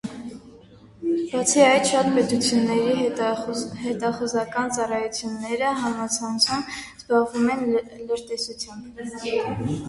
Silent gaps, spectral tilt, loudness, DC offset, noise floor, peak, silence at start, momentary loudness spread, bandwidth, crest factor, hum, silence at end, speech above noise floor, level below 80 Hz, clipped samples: none; -3.5 dB/octave; -23 LUFS; under 0.1%; -48 dBFS; -4 dBFS; 0.05 s; 13 LU; 11.5 kHz; 20 dB; none; 0 s; 25 dB; -56 dBFS; under 0.1%